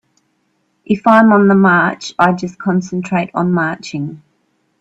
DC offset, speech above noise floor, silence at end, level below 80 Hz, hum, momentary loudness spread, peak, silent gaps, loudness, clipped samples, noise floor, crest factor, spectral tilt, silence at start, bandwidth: under 0.1%; 50 dB; 0.65 s; -56 dBFS; none; 13 LU; 0 dBFS; none; -13 LUFS; under 0.1%; -63 dBFS; 14 dB; -7 dB/octave; 0.9 s; 8 kHz